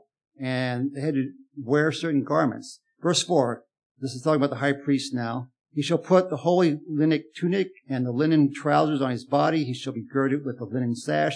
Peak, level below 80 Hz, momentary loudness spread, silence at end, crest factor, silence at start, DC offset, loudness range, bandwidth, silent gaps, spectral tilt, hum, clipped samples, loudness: -6 dBFS; -84 dBFS; 10 LU; 0 s; 20 dB; 0.4 s; under 0.1%; 2 LU; 10.5 kHz; 3.86-3.95 s; -6 dB/octave; none; under 0.1%; -25 LUFS